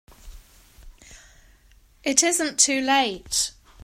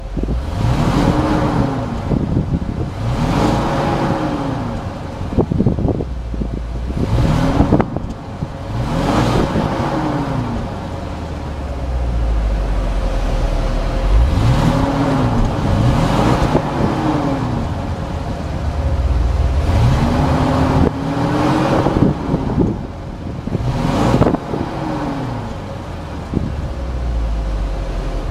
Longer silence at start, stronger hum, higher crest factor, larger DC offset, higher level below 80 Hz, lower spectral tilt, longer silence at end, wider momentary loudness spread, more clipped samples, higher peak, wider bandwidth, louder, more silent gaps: first, 0.25 s vs 0 s; neither; first, 24 dB vs 16 dB; neither; second, -50 dBFS vs -22 dBFS; second, 0 dB/octave vs -7.5 dB/octave; first, 0.35 s vs 0 s; second, 7 LU vs 10 LU; neither; about the same, -2 dBFS vs 0 dBFS; first, 16 kHz vs 13 kHz; second, -21 LUFS vs -18 LUFS; neither